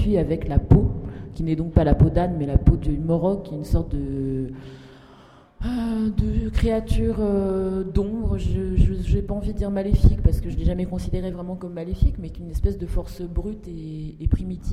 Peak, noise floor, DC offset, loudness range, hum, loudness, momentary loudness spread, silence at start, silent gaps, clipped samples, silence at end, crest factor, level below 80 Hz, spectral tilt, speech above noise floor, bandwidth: -4 dBFS; -49 dBFS; under 0.1%; 6 LU; none; -24 LUFS; 13 LU; 0 s; none; under 0.1%; 0 s; 18 dB; -26 dBFS; -9 dB/octave; 28 dB; 12.5 kHz